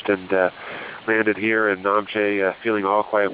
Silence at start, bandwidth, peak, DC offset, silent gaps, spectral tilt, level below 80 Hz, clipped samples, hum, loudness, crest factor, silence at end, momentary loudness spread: 0 s; 4 kHz; -6 dBFS; under 0.1%; none; -9 dB/octave; -62 dBFS; under 0.1%; none; -21 LUFS; 16 dB; 0 s; 5 LU